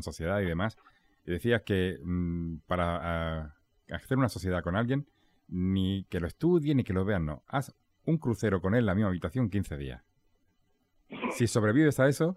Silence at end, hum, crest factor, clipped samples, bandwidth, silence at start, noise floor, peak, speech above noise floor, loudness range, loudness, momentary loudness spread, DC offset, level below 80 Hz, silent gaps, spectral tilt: 0 s; none; 18 dB; under 0.1%; 15.5 kHz; 0 s; -71 dBFS; -12 dBFS; 42 dB; 3 LU; -30 LUFS; 14 LU; under 0.1%; -50 dBFS; none; -7 dB/octave